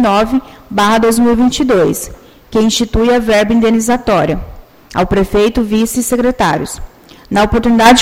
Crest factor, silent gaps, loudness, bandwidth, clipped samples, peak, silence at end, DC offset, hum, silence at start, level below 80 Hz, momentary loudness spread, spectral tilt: 12 dB; none; -12 LUFS; 16.5 kHz; 0.1%; 0 dBFS; 0 s; under 0.1%; none; 0 s; -28 dBFS; 9 LU; -4.5 dB/octave